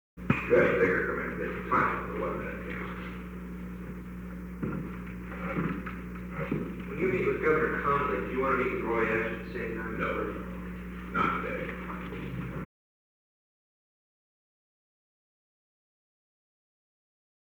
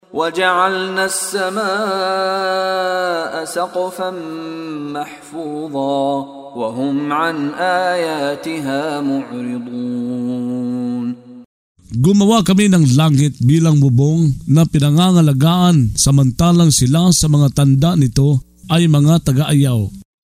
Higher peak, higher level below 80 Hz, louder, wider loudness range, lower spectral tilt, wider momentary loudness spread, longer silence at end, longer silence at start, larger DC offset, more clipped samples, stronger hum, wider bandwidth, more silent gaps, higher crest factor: second, -10 dBFS vs 0 dBFS; second, -48 dBFS vs -40 dBFS; second, -31 LUFS vs -15 LUFS; about the same, 10 LU vs 10 LU; first, -8 dB/octave vs -5.5 dB/octave; about the same, 14 LU vs 12 LU; first, 4.8 s vs 0.25 s; about the same, 0.15 s vs 0.15 s; neither; neither; first, 60 Hz at -45 dBFS vs none; first, over 20 kHz vs 16 kHz; second, none vs 11.45-11.75 s; first, 22 dB vs 14 dB